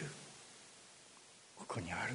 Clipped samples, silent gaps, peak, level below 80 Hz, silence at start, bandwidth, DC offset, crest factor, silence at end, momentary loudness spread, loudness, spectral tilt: under 0.1%; none; -28 dBFS; -72 dBFS; 0 s; 10.5 kHz; under 0.1%; 18 dB; 0 s; 16 LU; -49 LUFS; -4 dB/octave